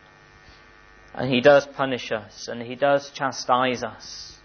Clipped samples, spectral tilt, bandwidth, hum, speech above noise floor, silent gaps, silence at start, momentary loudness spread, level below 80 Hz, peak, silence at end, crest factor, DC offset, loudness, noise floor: under 0.1%; -4.5 dB/octave; 6.6 kHz; none; 28 dB; none; 1.15 s; 18 LU; -58 dBFS; -6 dBFS; 0.1 s; 18 dB; under 0.1%; -22 LUFS; -51 dBFS